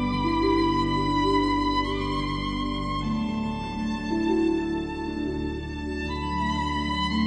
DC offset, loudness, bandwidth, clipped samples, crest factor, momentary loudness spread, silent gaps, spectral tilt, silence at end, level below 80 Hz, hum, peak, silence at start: under 0.1%; -26 LUFS; 9.6 kHz; under 0.1%; 14 dB; 7 LU; none; -6.5 dB/octave; 0 s; -38 dBFS; none; -12 dBFS; 0 s